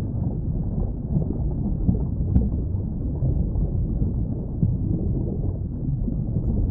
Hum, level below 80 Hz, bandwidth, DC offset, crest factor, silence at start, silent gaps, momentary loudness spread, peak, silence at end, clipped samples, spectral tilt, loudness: none; -28 dBFS; 1.6 kHz; under 0.1%; 18 dB; 0 s; none; 4 LU; -6 dBFS; 0 s; under 0.1%; -16 dB/octave; -26 LUFS